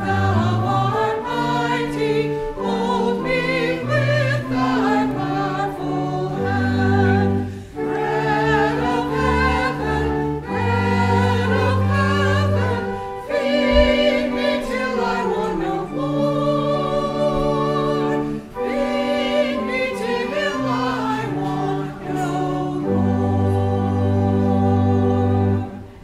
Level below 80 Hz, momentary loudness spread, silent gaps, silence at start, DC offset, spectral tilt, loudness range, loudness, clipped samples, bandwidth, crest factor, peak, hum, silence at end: -36 dBFS; 6 LU; none; 0 s; under 0.1%; -7 dB/octave; 3 LU; -20 LUFS; under 0.1%; 12.5 kHz; 18 dB; -2 dBFS; none; 0 s